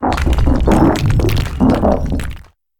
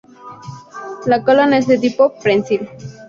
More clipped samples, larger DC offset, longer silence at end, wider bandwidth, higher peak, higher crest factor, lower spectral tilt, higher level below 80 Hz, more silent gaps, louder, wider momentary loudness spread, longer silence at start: neither; neither; first, 0.4 s vs 0.05 s; first, 18.5 kHz vs 7.4 kHz; about the same, 0 dBFS vs -2 dBFS; about the same, 14 dB vs 14 dB; about the same, -7 dB/octave vs -6 dB/octave; first, -18 dBFS vs -58 dBFS; neither; about the same, -15 LUFS vs -15 LUFS; second, 9 LU vs 21 LU; second, 0 s vs 0.25 s